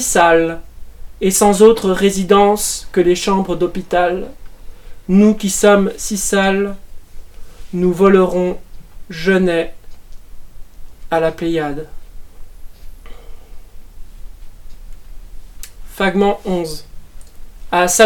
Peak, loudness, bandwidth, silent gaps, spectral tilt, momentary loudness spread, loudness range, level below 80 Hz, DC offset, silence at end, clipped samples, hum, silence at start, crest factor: 0 dBFS; -15 LUFS; 18 kHz; none; -4.5 dB/octave; 20 LU; 10 LU; -34 dBFS; under 0.1%; 0 s; 0.1%; none; 0 s; 16 dB